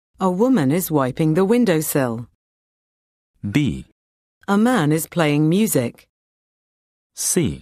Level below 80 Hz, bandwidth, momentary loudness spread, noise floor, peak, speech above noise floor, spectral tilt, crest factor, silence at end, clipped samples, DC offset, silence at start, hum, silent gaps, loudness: -50 dBFS; 14 kHz; 8 LU; under -90 dBFS; -4 dBFS; over 72 dB; -5.5 dB/octave; 16 dB; 0 s; under 0.1%; under 0.1%; 0.2 s; none; 2.35-3.34 s, 3.92-4.41 s, 6.09-7.10 s; -19 LUFS